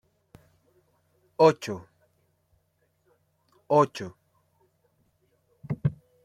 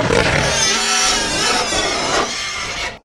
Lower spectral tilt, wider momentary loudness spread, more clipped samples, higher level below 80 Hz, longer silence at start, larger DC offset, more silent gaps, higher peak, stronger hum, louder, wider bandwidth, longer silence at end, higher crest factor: first, -7 dB/octave vs -2 dB/octave; first, 19 LU vs 8 LU; neither; second, -64 dBFS vs -34 dBFS; first, 1.4 s vs 0 s; neither; neither; second, -6 dBFS vs 0 dBFS; neither; second, -25 LUFS vs -15 LUFS; second, 13.5 kHz vs over 20 kHz; first, 0.3 s vs 0.05 s; first, 24 dB vs 16 dB